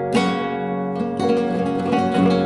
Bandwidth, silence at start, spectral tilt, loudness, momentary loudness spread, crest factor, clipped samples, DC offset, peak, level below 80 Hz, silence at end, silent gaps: 11.5 kHz; 0 s; -7 dB/octave; -21 LUFS; 6 LU; 16 dB; under 0.1%; under 0.1%; -4 dBFS; -56 dBFS; 0 s; none